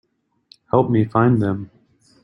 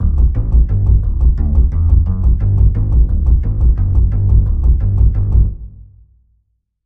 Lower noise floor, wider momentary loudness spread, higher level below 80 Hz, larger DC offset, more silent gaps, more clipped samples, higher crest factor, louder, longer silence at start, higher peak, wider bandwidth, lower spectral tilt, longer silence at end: second, -55 dBFS vs -63 dBFS; first, 12 LU vs 2 LU; second, -54 dBFS vs -12 dBFS; second, under 0.1% vs 0.9%; neither; neither; first, 18 dB vs 12 dB; second, -19 LUFS vs -15 LUFS; first, 0.75 s vs 0 s; about the same, -2 dBFS vs 0 dBFS; first, 5.6 kHz vs 1.4 kHz; second, -10.5 dB/octave vs -12.5 dB/octave; second, 0.55 s vs 1 s